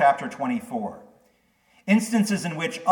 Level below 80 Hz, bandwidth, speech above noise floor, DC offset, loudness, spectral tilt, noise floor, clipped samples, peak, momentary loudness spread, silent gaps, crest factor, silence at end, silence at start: -72 dBFS; 18 kHz; 39 dB; under 0.1%; -25 LUFS; -5.5 dB/octave; -63 dBFS; under 0.1%; -6 dBFS; 11 LU; none; 18 dB; 0 s; 0 s